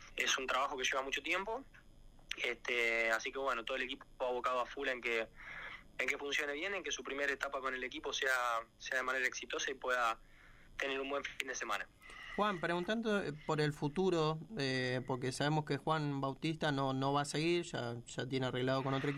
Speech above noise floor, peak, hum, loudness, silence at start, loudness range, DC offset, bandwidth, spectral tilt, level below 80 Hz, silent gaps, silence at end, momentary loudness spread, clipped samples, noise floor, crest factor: 21 dB; -14 dBFS; none; -37 LUFS; 0 s; 2 LU; under 0.1%; 15.5 kHz; -4 dB/octave; -64 dBFS; none; 0 s; 7 LU; under 0.1%; -59 dBFS; 24 dB